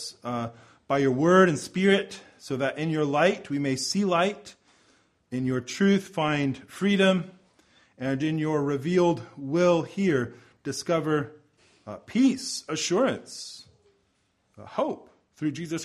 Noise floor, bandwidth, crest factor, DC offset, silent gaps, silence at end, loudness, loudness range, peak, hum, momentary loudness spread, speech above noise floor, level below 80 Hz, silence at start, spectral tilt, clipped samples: -71 dBFS; 13 kHz; 20 dB; under 0.1%; none; 0 s; -26 LUFS; 5 LU; -6 dBFS; none; 15 LU; 45 dB; -66 dBFS; 0 s; -5.5 dB/octave; under 0.1%